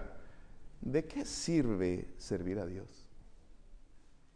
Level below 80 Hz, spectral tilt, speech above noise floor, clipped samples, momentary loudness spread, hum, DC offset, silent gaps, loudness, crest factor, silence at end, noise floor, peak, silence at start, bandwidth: -52 dBFS; -5.5 dB/octave; 22 dB; under 0.1%; 18 LU; none; under 0.1%; none; -37 LUFS; 20 dB; 0.1 s; -57 dBFS; -18 dBFS; 0 s; 10.5 kHz